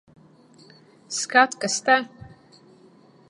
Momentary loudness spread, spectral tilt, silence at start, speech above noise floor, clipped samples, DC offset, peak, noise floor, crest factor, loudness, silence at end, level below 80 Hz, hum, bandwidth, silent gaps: 12 LU; -1.5 dB/octave; 1.1 s; 32 dB; under 0.1%; under 0.1%; -2 dBFS; -53 dBFS; 24 dB; -21 LUFS; 1 s; -66 dBFS; none; 11.5 kHz; none